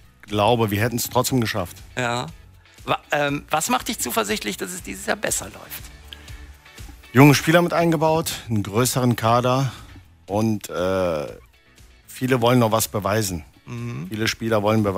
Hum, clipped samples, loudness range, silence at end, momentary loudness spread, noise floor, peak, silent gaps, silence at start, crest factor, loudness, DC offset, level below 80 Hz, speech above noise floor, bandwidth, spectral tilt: none; under 0.1%; 6 LU; 0 s; 18 LU; -51 dBFS; 0 dBFS; none; 0.25 s; 22 dB; -21 LUFS; under 0.1%; -48 dBFS; 30 dB; 16 kHz; -5 dB/octave